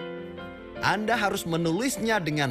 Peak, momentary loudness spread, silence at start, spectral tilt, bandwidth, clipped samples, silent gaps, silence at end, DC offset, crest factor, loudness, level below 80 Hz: -8 dBFS; 15 LU; 0 s; -4.5 dB/octave; 15.5 kHz; under 0.1%; none; 0 s; under 0.1%; 18 dB; -26 LUFS; -56 dBFS